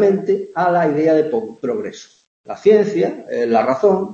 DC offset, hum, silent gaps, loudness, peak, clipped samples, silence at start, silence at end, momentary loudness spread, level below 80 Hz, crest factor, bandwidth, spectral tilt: under 0.1%; none; 2.27-2.44 s; -17 LUFS; -2 dBFS; under 0.1%; 0 s; 0 s; 10 LU; -66 dBFS; 14 dB; 7.4 kHz; -7 dB/octave